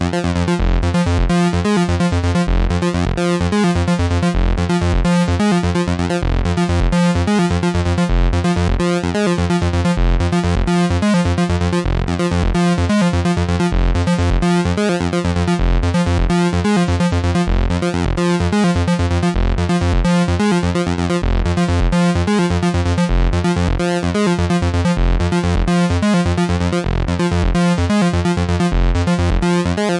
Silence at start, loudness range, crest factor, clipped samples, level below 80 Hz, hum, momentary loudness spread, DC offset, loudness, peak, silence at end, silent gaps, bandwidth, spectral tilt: 0 s; 0 LU; 12 dB; under 0.1%; -22 dBFS; none; 3 LU; under 0.1%; -17 LUFS; -4 dBFS; 0 s; none; 11.5 kHz; -6.5 dB/octave